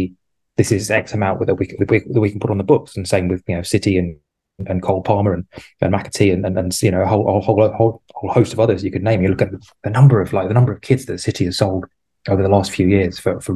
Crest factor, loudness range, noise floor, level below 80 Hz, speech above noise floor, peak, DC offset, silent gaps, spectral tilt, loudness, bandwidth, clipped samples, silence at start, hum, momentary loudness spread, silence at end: 16 dB; 3 LU; -47 dBFS; -38 dBFS; 31 dB; 0 dBFS; under 0.1%; none; -6.5 dB/octave; -17 LUFS; 12.5 kHz; under 0.1%; 0 s; none; 7 LU; 0 s